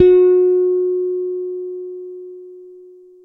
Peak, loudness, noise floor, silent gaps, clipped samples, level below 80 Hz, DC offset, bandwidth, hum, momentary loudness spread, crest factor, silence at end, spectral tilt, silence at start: -2 dBFS; -16 LUFS; -42 dBFS; none; under 0.1%; -54 dBFS; under 0.1%; 3.9 kHz; none; 23 LU; 16 dB; 0.45 s; -9.5 dB/octave; 0 s